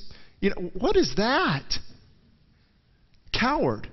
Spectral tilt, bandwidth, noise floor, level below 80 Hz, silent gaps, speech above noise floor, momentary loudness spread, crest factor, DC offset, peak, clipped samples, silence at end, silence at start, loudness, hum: -5 dB/octave; 6.4 kHz; -62 dBFS; -42 dBFS; none; 38 dB; 8 LU; 16 dB; under 0.1%; -10 dBFS; under 0.1%; 0 s; 0 s; -25 LUFS; none